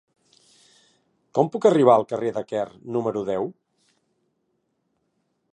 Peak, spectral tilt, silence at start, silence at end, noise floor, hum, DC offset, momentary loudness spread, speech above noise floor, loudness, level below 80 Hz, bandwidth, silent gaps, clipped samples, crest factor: -2 dBFS; -7 dB/octave; 1.35 s; 2 s; -73 dBFS; none; under 0.1%; 12 LU; 52 dB; -22 LUFS; -70 dBFS; 9.4 kHz; none; under 0.1%; 22 dB